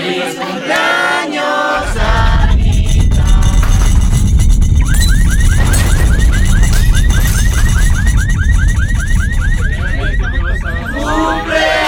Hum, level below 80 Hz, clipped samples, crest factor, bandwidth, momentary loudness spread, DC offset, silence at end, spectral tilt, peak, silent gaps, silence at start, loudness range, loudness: none; -12 dBFS; under 0.1%; 10 dB; 16.5 kHz; 5 LU; under 0.1%; 0 s; -5 dB/octave; 0 dBFS; none; 0 s; 3 LU; -13 LUFS